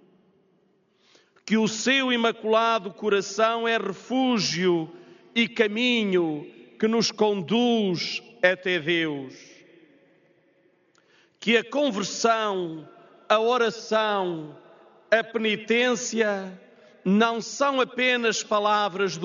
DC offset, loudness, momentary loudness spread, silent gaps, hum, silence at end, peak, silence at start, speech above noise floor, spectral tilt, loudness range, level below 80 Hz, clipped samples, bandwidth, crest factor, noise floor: under 0.1%; -24 LUFS; 8 LU; none; none; 0 s; -4 dBFS; 1.45 s; 41 dB; -2.5 dB/octave; 4 LU; -74 dBFS; under 0.1%; 7.4 kHz; 22 dB; -65 dBFS